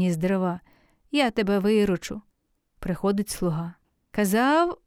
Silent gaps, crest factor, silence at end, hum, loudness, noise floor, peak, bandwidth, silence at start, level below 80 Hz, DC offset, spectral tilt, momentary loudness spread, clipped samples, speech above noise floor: none; 16 dB; 0.1 s; none; -25 LUFS; -71 dBFS; -8 dBFS; 16.5 kHz; 0 s; -50 dBFS; under 0.1%; -5.5 dB/octave; 15 LU; under 0.1%; 47 dB